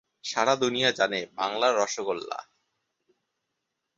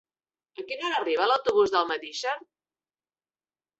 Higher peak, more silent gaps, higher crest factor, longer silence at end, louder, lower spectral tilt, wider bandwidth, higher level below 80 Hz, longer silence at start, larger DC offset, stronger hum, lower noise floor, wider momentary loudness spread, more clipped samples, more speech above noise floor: first, -6 dBFS vs -10 dBFS; neither; about the same, 22 dB vs 20 dB; first, 1.55 s vs 1.4 s; about the same, -26 LUFS vs -26 LUFS; about the same, -2.5 dB/octave vs -2.5 dB/octave; about the same, 8 kHz vs 8 kHz; about the same, -74 dBFS vs -70 dBFS; second, 0.25 s vs 0.6 s; neither; neither; second, -82 dBFS vs under -90 dBFS; second, 9 LU vs 14 LU; neither; second, 56 dB vs over 64 dB